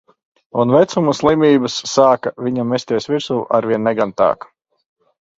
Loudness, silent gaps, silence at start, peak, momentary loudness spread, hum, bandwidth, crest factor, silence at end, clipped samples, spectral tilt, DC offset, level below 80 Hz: -16 LUFS; none; 0.55 s; 0 dBFS; 7 LU; none; 7.8 kHz; 16 dB; 1.05 s; under 0.1%; -5.5 dB/octave; under 0.1%; -56 dBFS